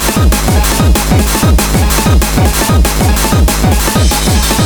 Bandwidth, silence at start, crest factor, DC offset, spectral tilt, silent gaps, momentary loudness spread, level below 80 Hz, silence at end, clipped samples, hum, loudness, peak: over 20 kHz; 0 s; 8 dB; 0.6%; -4.5 dB/octave; none; 1 LU; -12 dBFS; 0 s; under 0.1%; none; -10 LUFS; 0 dBFS